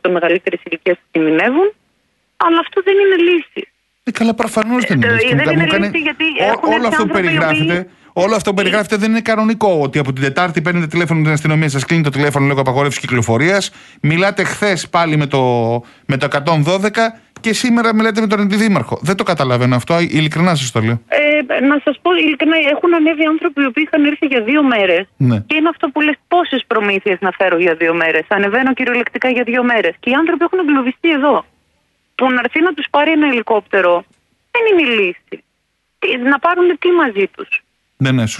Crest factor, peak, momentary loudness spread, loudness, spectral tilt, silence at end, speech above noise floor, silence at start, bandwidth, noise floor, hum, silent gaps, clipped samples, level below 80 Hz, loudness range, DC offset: 14 dB; 0 dBFS; 6 LU; -14 LUFS; -5.5 dB/octave; 0 s; 52 dB; 0.05 s; 12 kHz; -66 dBFS; none; none; under 0.1%; -54 dBFS; 2 LU; under 0.1%